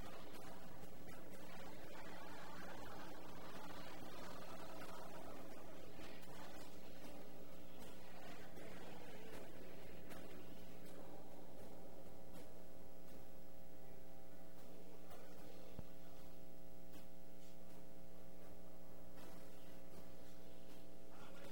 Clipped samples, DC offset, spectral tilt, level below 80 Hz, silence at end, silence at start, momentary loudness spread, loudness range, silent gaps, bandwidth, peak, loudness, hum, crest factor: under 0.1%; 0.8%; -5 dB/octave; -70 dBFS; 0 s; 0 s; 7 LU; 6 LU; none; 16 kHz; -36 dBFS; -58 LUFS; none; 22 dB